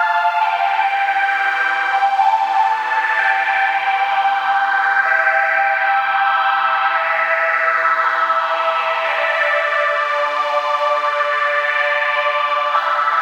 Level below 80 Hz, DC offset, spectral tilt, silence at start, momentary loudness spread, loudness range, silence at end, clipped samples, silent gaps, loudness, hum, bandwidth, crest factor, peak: under -90 dBFS; under 0.1%; -0.5 dB/octave; 0 s; 2 LU; 2 LU; 0 s; under 0.1%; none; -16 LUFS; none; 16 kHz; 14 dB; -4 dBFS